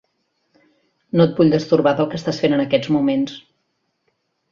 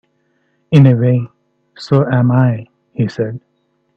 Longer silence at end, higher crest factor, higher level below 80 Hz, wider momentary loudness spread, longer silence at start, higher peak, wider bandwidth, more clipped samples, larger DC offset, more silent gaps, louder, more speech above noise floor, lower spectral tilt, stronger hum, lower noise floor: first, 1.15 s vs 0.6 s; about the same, 18 dB vs 14 dB; second, -58 dBFS vs -52 dBFS; second, 8 LU vs 20 LU; first, 1.15 s vs 0.7 s; about the same, -2 dBFS vs 0 dBFS; about the same, 7.4 kHz vs 6.8 kHz; neither; neither; neither; second, -18 LUFS vs -14 LUFS; first, 54 dB vs 50 dB; second, -7.5 dB/octave vs -9.5 dB/octave; neither; first, -71 dBFS vs -62 dBFS